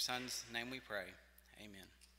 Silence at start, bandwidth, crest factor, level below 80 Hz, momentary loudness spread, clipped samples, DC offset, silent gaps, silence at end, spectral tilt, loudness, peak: 0 s; 16 kHz; 24 dB; -72 dBFS; 18 LU; under 0.1%; under 0.1%; none; 0 s; -1.5 dB/octave; -44 LUFS; -24 dBFS